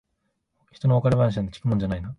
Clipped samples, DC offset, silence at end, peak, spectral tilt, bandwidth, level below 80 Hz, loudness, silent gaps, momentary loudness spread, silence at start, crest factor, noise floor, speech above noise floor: under 0.1%; under 0.1%; 0.05 s; -8 dBFS; -9 dB/octave; 8.6 kHz; -44 dBFS; -23 LUFS; none; 7 LU; 0.85 s; 16 dB; -75 dBFS; 53 dB